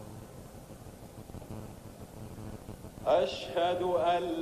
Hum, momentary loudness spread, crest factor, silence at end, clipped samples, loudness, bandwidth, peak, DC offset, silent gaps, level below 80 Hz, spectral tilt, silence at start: none; 20 LU; 18 dB; 0 s; under 0.1%; -30 LUFS; 14.5 kHz; -16 dBFS; under 0.1%; none; -56 dBFS; -5.5 dB/octave; 0 s